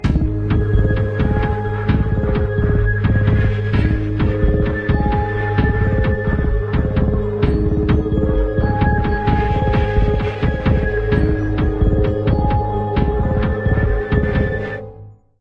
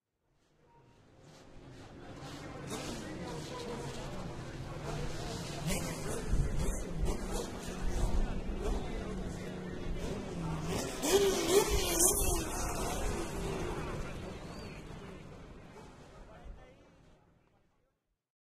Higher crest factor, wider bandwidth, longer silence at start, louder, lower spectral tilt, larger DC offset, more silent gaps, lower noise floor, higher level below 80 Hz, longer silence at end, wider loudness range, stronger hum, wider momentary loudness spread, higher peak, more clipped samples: second, 14 dB vs 30 dB; second, 5.4 kHz vs 15.5 kHz; second, 0 s vs 1.2 s; first, -18 LUFS vs -36 LUFS; first, -9.5 dB/octave vs -4 dB/octave; neither; neither; second, -39 dBFS vs -80 dBFS; first, -22 dBFS vs -42 dBFS; second, 0.3 s vs 1.65 s; second, 1 LU vs 16 LU; neither; second, 2 LU vs 23 LU; first, -2 dBFS vs -6 dBFS; neither